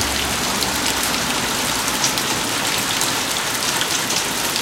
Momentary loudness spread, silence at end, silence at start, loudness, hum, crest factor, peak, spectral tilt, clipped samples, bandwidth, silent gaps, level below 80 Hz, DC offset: 1 LU; 0 s; 0 s; -18 LUFS; none; 20 dB; 0 dBFS; -1 dB/octave; under 0.1%; 17 kHz; none; -42 dBFS; under 0.1%